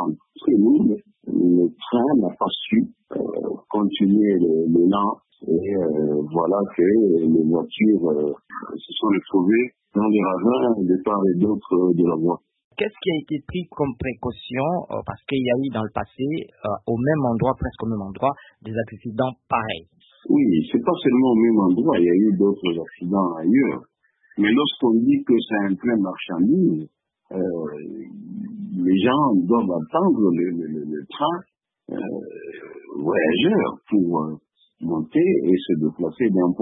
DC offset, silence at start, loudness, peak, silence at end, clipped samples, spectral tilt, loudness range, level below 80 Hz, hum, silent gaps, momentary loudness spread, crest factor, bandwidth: under 0.1%; 0 s; -21 LUFS; -6 dBFS; 0 s; under 0.1%; -11.5 dB/octave; 5 LU; -52 dBFS; none; 12.64-12.71 s; 13 LU; 16 dB; 4 kHz